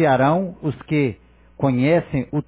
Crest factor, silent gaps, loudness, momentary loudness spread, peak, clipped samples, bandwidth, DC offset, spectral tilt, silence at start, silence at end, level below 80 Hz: 14 dB; none; -20 LUFS; 8 LU; -6 dBFS; under 0.1%; 4 kHz; under 0.1%; -11.5 dB/octave; 0 s; 0.05 s; -48 dBFS